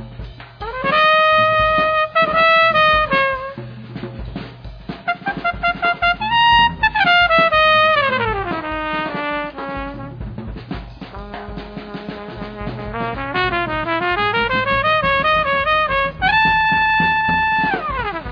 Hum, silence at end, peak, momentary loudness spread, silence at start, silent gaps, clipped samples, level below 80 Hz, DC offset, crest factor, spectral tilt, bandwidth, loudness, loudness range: none; 0 s; -2 dBFS; 19 LU; 0 s; none; under 0.1%; -38 dBFS; under 0.1%; 16 dB; -6 dB/octave; 5.4 kHz; -16 LUFS; 13 LU